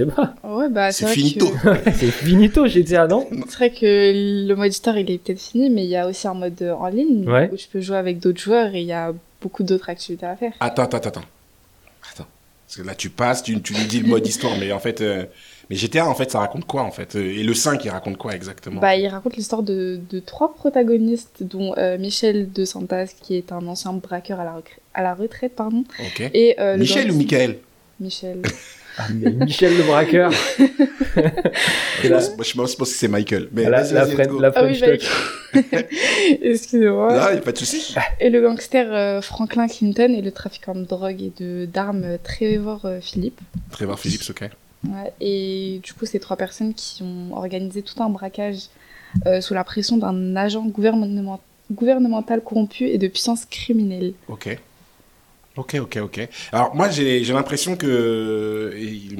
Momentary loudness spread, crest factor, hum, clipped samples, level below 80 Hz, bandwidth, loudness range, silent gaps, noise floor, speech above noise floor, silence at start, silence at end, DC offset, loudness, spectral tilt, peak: 14 LU; 18 dB; none; under 0.1%; -42 dBFS; 18 kHz; 9 LU; none; -54 dBFS; 34 dB; 0 s; 0 s; under 0.1%; -20 LUFS; -5 dB/octave; -2 dBFS